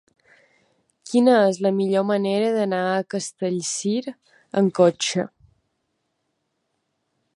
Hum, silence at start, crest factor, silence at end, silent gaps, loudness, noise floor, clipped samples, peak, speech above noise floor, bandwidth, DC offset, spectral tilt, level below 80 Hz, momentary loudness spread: none; 1.05 s; 20 dB; 2.1 s; none; -21 LUFS; -75 dBFS; under 0.1%; -2 dBFS; 54 dB; 11.5 kHz; under 0.1%; -5 dB/octave; -72 dBFS; 11 LU